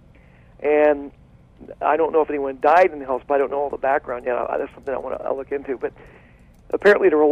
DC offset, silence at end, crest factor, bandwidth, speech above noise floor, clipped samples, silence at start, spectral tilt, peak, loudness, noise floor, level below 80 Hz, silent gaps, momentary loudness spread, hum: under 0.1%; 0 s; 16 dB; 8.8 kHz; 29 dB; under 0.1%; 0.6 s; -6.5 dB/octave; -4 dBFS; -21 LUFS; -49 dBFS; -52 dBFS; none; 13 LU; none